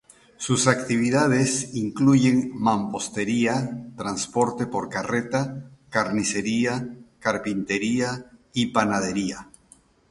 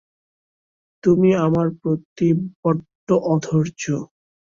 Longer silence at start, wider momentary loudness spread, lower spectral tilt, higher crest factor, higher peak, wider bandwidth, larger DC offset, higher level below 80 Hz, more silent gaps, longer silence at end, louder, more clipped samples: second, 0.4 s vs 1.05 s; about the same, 11 LU vs 9 LU; second, -4.5 dB/octave vs -7.5 dB/octave; first, 22 dB vs 16 dB; about the same, -2 dBFS vs -4 dBFS; first, 11.5 kHz vs 7.6 kHz; neither; about the same, -58 dBFS vs -56 dBFS; second, none vs 2.05-2.16 s, 2.55-2.63 s, 2.95-3.07 s; first, 0.65 s vs 0.45 s; second, -24 LUFS vs -20 LUFS; neither